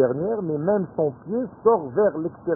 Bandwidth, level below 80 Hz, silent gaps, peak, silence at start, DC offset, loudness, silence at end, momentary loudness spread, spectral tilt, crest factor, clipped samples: 1.8 kHz; -58 dBFS; none; -4 dBFS; 0 s; under 0.1%; -23 LUFS; 0 s; 8 LU; -15 dB/octave; 18 dB; under 0.1%